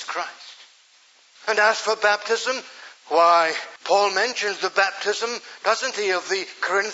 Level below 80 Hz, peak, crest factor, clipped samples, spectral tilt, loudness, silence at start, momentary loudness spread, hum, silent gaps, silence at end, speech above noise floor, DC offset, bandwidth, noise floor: under -90 dBFS; -4 dBFS; 18 dB; under 0.1%; -0.5 dB/octave; -22 LUFS; 0 s; 12 LU; none; none; 0 s; 33 dB; under 0.1%; 8 kHz; -55 dBFS